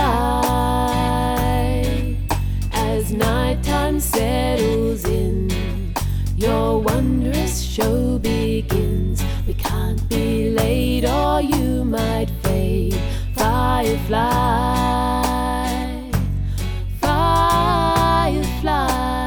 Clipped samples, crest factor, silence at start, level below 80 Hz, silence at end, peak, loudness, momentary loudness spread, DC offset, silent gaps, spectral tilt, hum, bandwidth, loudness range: under 0.1%; 14 dB; 0 s; -24 dBFS; 0 s; -4 dBFS; -20 LUFS; 6 LU; under 0.1%; none; -5.5 dB/octave; none; over 20 kHz; 1 LU